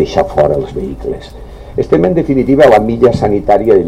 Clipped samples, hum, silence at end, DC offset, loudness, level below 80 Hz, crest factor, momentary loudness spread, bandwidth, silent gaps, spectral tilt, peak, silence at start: 0.5%; none; 0 s; 0.4%; -11 LUFS; -30 dBFS; 10 dB; 15 LU; 12.5 kHz; none; -7.5 dB/octave; 0 dBFS; 0 s